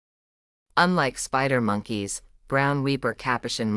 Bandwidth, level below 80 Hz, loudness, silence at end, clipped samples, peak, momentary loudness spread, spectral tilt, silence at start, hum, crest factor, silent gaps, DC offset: 12 kHz; -54 dBFS; -25 LUFS; 0 s; under 0.1%; -6 dBFS; 8 LU; -4.5 dB/octave; 0.75 s; none; 20 dB; none; under 0.1%